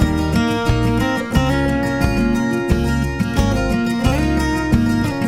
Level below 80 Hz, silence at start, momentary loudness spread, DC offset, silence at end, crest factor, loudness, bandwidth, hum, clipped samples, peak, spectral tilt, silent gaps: -24 dBFS; 0 s; 2 LU; under 0.1%; 0 s; 16 dB; -18 LUFS; 16 kHz; none; under 0.1%; -2 dBFS; -6.5 dB/octave; none